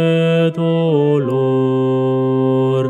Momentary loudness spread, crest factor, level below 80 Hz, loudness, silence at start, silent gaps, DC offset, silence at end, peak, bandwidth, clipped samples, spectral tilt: 2 LU; 12 dB; -72 dBFS; -15 LUFS; 0 s; none; under 0.1%; 0 s; -2 dBFS; 8.6 kHz; under 0.1%; -9 dB/octave